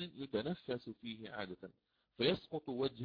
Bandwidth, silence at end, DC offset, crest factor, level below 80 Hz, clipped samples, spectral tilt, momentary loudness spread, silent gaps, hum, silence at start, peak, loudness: 5.2 kHz; 0 s; under 0.1%; 20 dB; -72 dBFS; under 0.1%; -4 dB/octave; 12 LU; none; none; 0 s; -22 dBFS; -41 LUFS